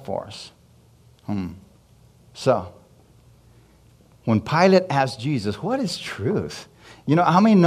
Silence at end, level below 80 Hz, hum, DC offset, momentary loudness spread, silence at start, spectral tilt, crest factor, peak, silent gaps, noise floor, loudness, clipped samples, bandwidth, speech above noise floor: 0 s; -58 dBFS; none; under 0.1%; 21 LU; 0 s; -6.5 dB/octave; 20 dB; -4 dBFS; none; -54 dBFS; -22 LUFS; under 0.1%; 13 kHz; 33 dB